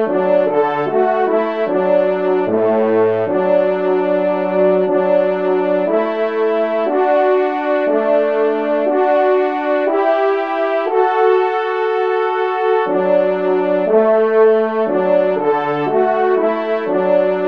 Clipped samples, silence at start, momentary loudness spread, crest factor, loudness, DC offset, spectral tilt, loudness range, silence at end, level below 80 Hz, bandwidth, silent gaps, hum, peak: under 0.1%; 0 s; 3 LU; 14 dB; -15 LUFS; 0.4%; -8 dB/octave; 1 LU; 0 s; -70 dBFS; 5.4 kHz; none; none; -2 dBFS